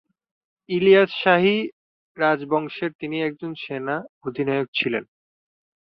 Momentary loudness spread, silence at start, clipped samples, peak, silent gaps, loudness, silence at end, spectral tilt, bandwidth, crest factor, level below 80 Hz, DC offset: 13 LU; 0.7 s; under 0.1%; -2 dBFS; 1.73-2.15 s, 2.95-2.99 s, 4.09-4.21 s, 4.68-4.73 s; -22 LUFS; 0.85 s; -8 dB/octave; 5.6 kHz; 20 dB; -66 dBFS; under 0.1%